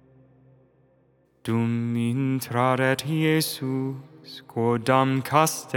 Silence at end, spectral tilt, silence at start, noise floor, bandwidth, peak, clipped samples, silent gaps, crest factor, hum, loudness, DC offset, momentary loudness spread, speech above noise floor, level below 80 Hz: 0 s; -5.5 dB/octave; 1.45 s; -63 dBFS; over 20 kHz; -4 dBFS; under 0.1%; none; 22 dB; none; -24 LUFS; under 0.1%; 13 LU; 39 dB; -70 dBFS